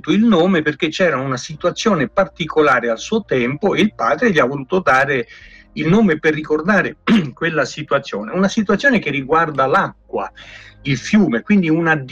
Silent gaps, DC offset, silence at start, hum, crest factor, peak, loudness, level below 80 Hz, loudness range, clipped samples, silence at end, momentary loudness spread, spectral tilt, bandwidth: none; under 0.1%; 0.05 s; none; 12 dB; -4 dBFS; -16 LUFS; -48 dBFS; 1 LU; under 0.1%; 0 s; 9 LU; -6 dB/octave; 8.4 kHz